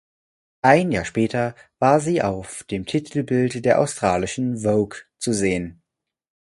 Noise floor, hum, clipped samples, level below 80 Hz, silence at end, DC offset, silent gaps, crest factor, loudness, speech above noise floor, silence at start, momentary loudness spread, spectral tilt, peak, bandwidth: -83 dBFS; none; under 0.1%; -50 dBFS; 0.75 s; under 0.1%; none; 22 dB; -21 LUFS; 62 dB; 0.65 s; 11 LU; -5.5 dB/octave; 0 dBFS; 11.5 kHz